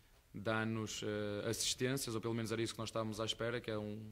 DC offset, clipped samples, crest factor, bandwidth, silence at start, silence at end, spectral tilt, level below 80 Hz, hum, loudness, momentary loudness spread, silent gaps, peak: under 0.1%; under 0.1%; 18 dB; 16 kHz; 0.35 s; 0 s; -4 dB/octave; -66 dBFS; none; -40 LUFS; 5 LU; none; -22 dBFS